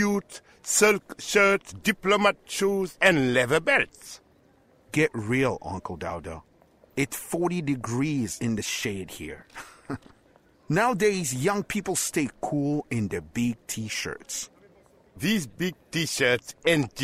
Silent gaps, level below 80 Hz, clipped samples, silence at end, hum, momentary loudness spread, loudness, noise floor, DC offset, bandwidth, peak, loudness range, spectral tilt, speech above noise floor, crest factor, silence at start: none; -56 dBFS; under 0.1%; 0 s; none; 17 LU; -26 LUFS; -60 dBFS; under 0.1%; 16 kHz; -6 dBFS; 7 LU; -4 dB/octave; 34 dB; 22 dB; 0 s